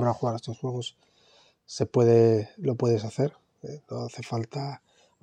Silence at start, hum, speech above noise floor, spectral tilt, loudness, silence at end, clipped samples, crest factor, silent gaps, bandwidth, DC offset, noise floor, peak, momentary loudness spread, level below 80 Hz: 0 s; none; 34 dB; -7 dB/octave; -27 LUFS; 0.45 s; under 0.1%; 20 dB; none; 9.4 kHz; under 0.1%; -61 dBFS; -8 dBFS; 20 LU; -72 dBFS